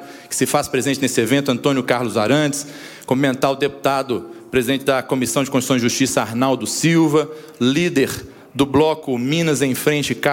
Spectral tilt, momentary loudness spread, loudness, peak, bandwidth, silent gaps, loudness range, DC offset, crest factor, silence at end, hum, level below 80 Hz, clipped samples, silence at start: -4.5 dB/octave; 6 LU; -18 LUFS; -2 dBFS; 17 kHz; none; 2 LU; under 0.1%; 16 dB; 0 s; none; -52 dBFS; under 0.1%; 0 s